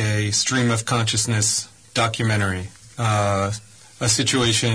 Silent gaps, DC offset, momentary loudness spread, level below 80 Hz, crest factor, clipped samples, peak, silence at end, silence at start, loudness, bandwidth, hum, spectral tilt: none; 0.1%; 9 LU; -50 dBFS; 14 dB; under 0.1%; -6 dBFS; 0 s; 0 s; -20 LUFS; 11 kHz; none; -3.5 dB/octave